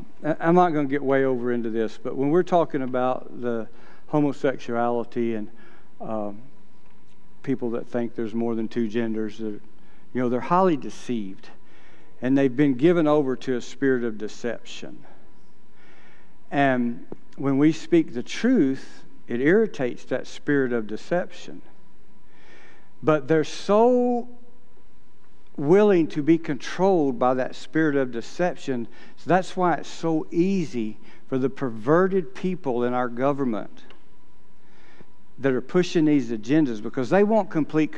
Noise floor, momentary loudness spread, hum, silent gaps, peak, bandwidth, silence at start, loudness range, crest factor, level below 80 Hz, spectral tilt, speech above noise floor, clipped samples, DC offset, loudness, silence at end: -57 dBFS; 13 LU; none; none; -4 dBFS; 9.2 kHz; 0 s; 7 LU; 20 dB; -64 dBFS; -7 dB/octave; 34 dB; under 0.1%; 3%; -24 LUFS; 0 s